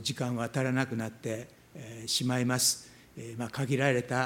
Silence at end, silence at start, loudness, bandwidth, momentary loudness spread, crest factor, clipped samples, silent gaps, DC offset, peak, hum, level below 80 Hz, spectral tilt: 0 s; 0 s; -30 LUFS; 17 kHz; 19 LU; 22 dB; under 0.1%; none; under 0.1%; -10 dBFS; none; -68 dBFS; -4 dB/octave